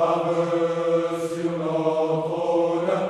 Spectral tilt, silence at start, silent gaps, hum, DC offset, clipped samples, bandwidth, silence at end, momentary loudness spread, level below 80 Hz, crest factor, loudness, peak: -7 dB/octave; 0 s; none; none; under 0.1%; under 0.1%; 12 kHz; 0 s; 4 LU; -66 dBFS; 12 dB; -23 LUFS; -10 dBFS